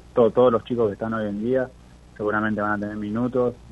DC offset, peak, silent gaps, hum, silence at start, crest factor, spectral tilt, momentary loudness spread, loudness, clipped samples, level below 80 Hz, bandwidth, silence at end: under 0.1%; -6 dBFS; none; 60 Hz at -50 dBFS; 0.15 s; 18 dB; -8.5 dB/octave; 9 LU; -23 LUFS; under 0.1%; -50 dBFS; 8 kHz; 0 s